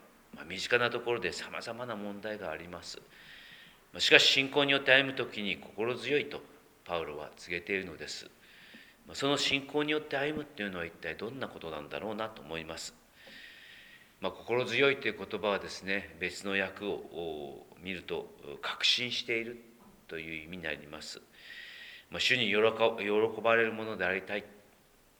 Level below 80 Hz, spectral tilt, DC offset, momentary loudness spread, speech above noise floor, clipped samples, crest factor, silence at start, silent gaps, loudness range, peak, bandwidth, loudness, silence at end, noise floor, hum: -68 dBFS; -3 dB/octave; under 0.1%; 20 LU; 31 dB; under 0.1%; 30 dB; 0.35 s; none; 11 LU; -4 dBFS; over 20 kHz; -31 LUFS; 0.65 s; -63 dBFS; none